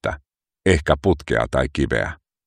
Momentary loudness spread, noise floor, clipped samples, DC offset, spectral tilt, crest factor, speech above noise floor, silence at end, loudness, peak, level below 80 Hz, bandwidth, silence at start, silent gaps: 10 LU; -54 dBFS; under 0.1%; under 0.1%; -6 dB/octave; 20 dB; 35 dB; 0.3 s; -21 LUFS; 0 dBFS; -34 dBFS; 11 kHz; 0.05 s; none